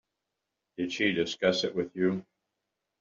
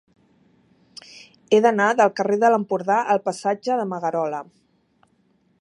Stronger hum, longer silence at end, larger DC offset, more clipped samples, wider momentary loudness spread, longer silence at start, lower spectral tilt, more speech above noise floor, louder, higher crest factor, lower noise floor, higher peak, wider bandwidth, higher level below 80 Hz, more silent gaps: neither; second, 0.8 s vs 1.15 s; neither; neither; about the same, 10 LU vs 10 LU; second, 0.8 s vs 1.15 s; second, -3.5 dB/octave vs -5 dB/octave; first, 56 dB vs 43 dB; second, -29 LUFS vs -20 LUFS; about the same, 22 dB vs 18 dB; first, -85 dBFS vs -63 dBFS; second, -10 dBFS vs -4 dBFS; second, 7.8 kHz vs 11.5 kHz; first, -70 dBFS vs -76 dBFS; neither